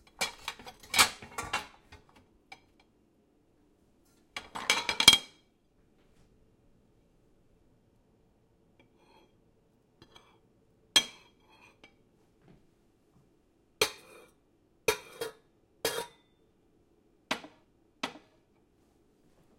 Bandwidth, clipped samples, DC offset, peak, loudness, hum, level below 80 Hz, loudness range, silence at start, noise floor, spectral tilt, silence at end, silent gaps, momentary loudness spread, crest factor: 16.5 kHz; under 0.1%; under 0.1%; -2 dBFS; -29 LUFS; none; -66 dBFS; 14 LU; 0.2 s; -68 dBFS; 0 dB/octave; 1.4 s; none; 24 LU; 36 dB